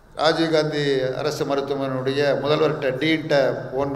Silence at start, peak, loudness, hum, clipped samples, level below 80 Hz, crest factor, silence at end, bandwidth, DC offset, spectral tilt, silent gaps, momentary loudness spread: 0.15 s; -2 dBFS; -21 LUFS; none; under 0.1%; -54 dBFS; 18 dB; 0 s; 14.5 kHz; under 0.1%; -5.5 dB/octave; none; 5 LU